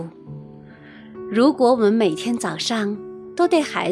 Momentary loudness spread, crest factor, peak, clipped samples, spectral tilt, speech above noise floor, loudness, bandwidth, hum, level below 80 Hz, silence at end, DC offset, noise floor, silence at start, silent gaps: 22 LU; 16 dB; -4 dBFS; under 0.1%; -5 dB/octave; 24 dB; -19 LUFS; 13.5 kHz; none; -64 dBFS; 0 s; under 0.1%; -42 dBFS; 0 s; none